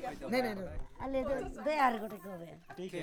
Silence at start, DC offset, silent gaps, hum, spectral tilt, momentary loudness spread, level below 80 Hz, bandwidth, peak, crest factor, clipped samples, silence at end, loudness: 0 s; under 0.1%; none; none; -5.5 dB/octave; 16 LU; -50 dBFS; over 20 kHz; -18 dBFS; 18 dB; under 0.1%; 0 s; -36 LUFS